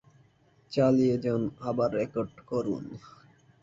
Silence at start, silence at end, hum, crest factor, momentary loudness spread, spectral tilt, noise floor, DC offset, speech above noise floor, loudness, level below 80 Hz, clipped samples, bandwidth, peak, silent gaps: 0.7 s; 0.55 s; none; 18 dB; 12 LU; -8 dB/octave; -63 dBFS; under 0.1%; 35 dB; -29 LUFS; -62 dBFS; under 0.1%; 7.6 kHz; -12 dBFS; none